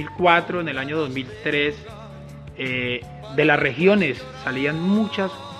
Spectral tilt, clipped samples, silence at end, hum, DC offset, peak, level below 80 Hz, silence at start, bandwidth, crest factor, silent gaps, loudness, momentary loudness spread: -6.5 dB/octave; under 0.1%; 0 s; none; under 0.1%; -4 dBFS; -50 dBFS; 0 s; 11.5 kHz; 20 dB; none; -21 LUFS; 19 LU